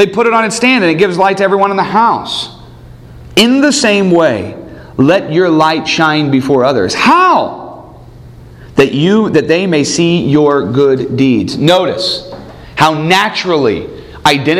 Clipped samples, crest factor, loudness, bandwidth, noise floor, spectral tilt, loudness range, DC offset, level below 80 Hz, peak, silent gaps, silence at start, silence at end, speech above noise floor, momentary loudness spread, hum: 0.2%; 10 dB; -10 LUFS; 16 kHz; -33 dBFS; -5 dB/octave; 2 LU; under 0.1%; -42 dBFS; 0 dBFS; none; 0 s; 0 s; 24 dB; 11 LU; none